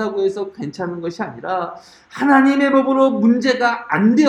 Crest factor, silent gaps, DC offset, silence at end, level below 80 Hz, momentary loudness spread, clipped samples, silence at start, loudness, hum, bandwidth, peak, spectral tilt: 16 dB; none; under 0.1%; 0 s; -62 dBFS; 13 LU; under 0.1%; 0 s; -17 LUFS; none; 9 kHz; 0 dBFS; -6 dB/octave